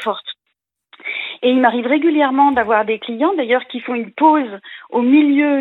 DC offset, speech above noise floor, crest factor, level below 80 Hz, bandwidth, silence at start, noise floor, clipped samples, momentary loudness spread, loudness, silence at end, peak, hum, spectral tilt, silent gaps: under 0.1%; 58 dB; 16 dB; -60 dBFS; 4.1 kHz; 0 s; -73 dBFS; under 0.1%; 13 LU; -16 LUFS; 0 s; 0 dBFS; none; -6.5 dB/octave; none